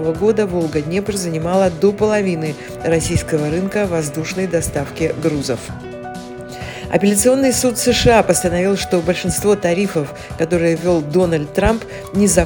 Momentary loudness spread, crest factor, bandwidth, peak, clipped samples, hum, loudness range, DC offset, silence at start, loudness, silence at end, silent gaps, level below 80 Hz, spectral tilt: 12 LU; 16 dB; 18 kHz; 0 dBFS; under 0.1%; none; 5 LU; under 0.1%; 0 s; -17 LUFS; 0 s; none; -36 dBFS; -5 dB/octave